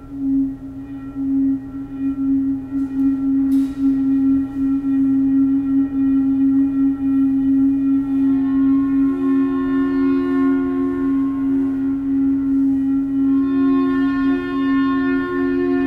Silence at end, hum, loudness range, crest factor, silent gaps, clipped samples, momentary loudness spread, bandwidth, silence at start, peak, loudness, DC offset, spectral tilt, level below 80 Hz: 0 s; none; 2 LU; 8 dB; none; under 0.1%; 5 LU; 4.1 kHz; 0 s; -8 dBFS; -18 LUFS; under 0.1%; -8.5 dB/octave; -44 dBFS